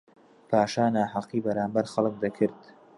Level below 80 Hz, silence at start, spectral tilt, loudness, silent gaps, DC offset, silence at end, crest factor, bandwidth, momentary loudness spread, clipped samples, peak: -66 dBFS; 0.5 s; -6.5 dB/octave; -27 LUFS; none; under 0.1%; 0.4 s; 20 dB; 11.5 kHz; 5 LU; under 0.1%; -8 dBFS